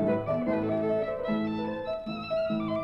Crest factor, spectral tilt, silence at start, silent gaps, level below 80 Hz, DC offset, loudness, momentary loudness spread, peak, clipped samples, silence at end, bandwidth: 12 dB; -8.5 dB/octave; 0 s; none; -56 dBFS; under 0.1%; -30 LUFS; 5 LU; -18 dBFS; under 0.1%; 0 s; 5.8 kHz